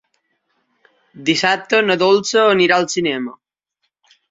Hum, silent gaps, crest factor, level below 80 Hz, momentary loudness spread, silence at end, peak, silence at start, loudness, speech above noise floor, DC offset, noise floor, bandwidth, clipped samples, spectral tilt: none; none; 16 dB; -62 dBFS; 10 LU; 1 s; -2 dBFS; 1.15 s; -15 LUFS; 57 dB; under 0.1%; -73 dBFS; 8 kHz; under 0.1%; -3.5 dB/octave